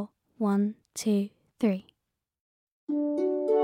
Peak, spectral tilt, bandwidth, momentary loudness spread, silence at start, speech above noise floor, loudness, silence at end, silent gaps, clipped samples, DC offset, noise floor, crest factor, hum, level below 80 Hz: -16 dBFS; -6.5 dB/octave; 15.5 kHz; 10 LU; 0 s; 56 dB; -29 LUFS; 0 s; 2.41-2.87 s; under 0.1%; under 0.1%; -83 dBFS; 14 dB; none; -78 dBFS